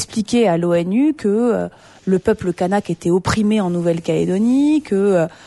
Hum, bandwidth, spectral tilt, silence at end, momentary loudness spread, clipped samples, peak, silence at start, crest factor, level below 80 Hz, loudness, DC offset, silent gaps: none; 11.5 kHz; -6.5 dB/octave; 0.15 s; 4 LU; under 0.1%; -4 dBFS; 0 s; 14 dB; -46 dBFS; -17 LUFS; under 0.1%; none